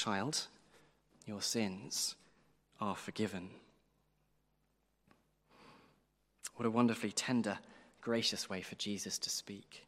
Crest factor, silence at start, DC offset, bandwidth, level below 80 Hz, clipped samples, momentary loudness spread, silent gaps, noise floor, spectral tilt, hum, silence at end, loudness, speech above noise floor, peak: 24 dB; 0 s; under 0.1%; 16 kHz; -80 dBFS; under 0.1%; 16 LU; none; -79 dBFS; -3.5 dB/octave; none; 0.05 s; -38 LUFS; 40 dB; -18 dBFS